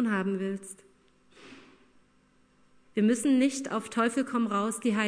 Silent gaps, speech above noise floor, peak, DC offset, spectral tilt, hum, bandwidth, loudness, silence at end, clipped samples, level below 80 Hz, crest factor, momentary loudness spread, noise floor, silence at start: none; 37 dB; -14 dBFS; under 0.1%; -5 dB/octave; none; 11 kHz; -28 LUFS; 0 s; under 0.1%; -74 dBFS; 16 dB; 12 LU; -64 dBFS; 0 s